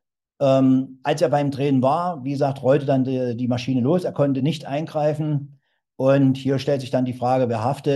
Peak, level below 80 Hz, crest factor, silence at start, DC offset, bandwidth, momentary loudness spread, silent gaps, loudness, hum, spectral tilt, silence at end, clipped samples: -4 dBFS; -66 dBFS; 16 dB; 0.4 s; under 0.1%; 12 kHz; 7 LU; none; -21 LUFS; none; -8 dB/octave; 0 s; under 0.1%